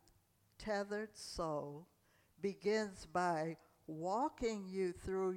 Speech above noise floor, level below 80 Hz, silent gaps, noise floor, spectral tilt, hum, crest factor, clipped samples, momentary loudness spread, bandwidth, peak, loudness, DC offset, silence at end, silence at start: 33 dB; -64 dBFS; none; -74 dBFS; -5.5 dB/octave; none; 16 dB; under 0.1%; 12 LU; 16 kHz; -24 dBFS; -41 LUFS; under 0.1%; 0 s; 0.6 s